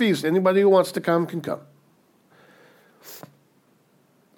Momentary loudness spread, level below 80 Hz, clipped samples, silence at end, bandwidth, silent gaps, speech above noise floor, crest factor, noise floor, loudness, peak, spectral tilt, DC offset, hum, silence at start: 25 LU; -78 dBFS; under 0.1%; 1.2 s; 18 kHz; none; 40 dB; 18 dB; -61 dBFS; -21 LUFS; -6 dBFS; -6 dB/octave; under 0.1%; none; 0 s